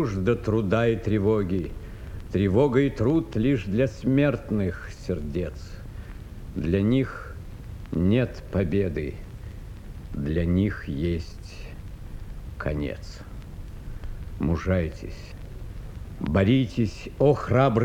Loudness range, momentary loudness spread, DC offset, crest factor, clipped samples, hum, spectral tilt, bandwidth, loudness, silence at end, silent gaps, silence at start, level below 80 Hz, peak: 8 LU; 19 LU; under 0.1%; 18 dB; under 0.1%; none; -8.5 dB/octave; 15.5 kHz; -25 LUFS; 0 s; none; 0 s; -38 dBFS; -6 dBFS